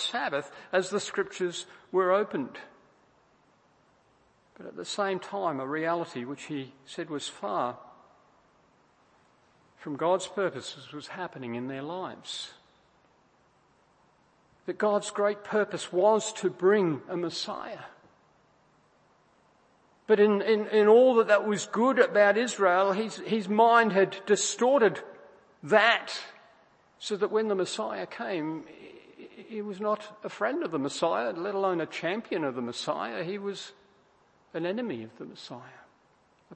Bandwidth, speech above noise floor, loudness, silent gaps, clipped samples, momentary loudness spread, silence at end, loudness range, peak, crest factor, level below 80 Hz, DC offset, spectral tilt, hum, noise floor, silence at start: 8.8 kHz; 37 dB; -28 LUFS; none; under 0.1%; 19 LU; 0 s; 14 LU; -6 dBFS; 24 dB; -80 dBFS; under 0.1%; -4 dB/octave; none; -65 dBFS; 0 s